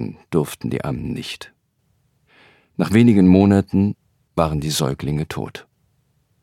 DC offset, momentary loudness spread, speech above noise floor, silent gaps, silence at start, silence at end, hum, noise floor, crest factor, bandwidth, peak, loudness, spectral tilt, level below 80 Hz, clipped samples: under 0.1%; 19 LU; 48 dB; none; 0 s; 0.8 s; none; -65 dBFS; 18 dB; 15.5 kHz; -2 dBFS; -19 LUFS; -6.5 dB/octave; -44 dBFS; under 0.1%